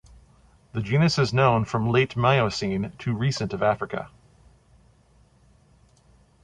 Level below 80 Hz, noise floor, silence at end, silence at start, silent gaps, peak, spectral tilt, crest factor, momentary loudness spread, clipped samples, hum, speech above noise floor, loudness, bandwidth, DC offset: -52 dBFS; -58 dBFS; 2.35 s; 0.75 s; none; -6 dBFS; -6 dB/octave; 20 dB; 12 LU; under 0.1%; none; 36 dB; -24 LUFS; 10 kHz; under 0.1%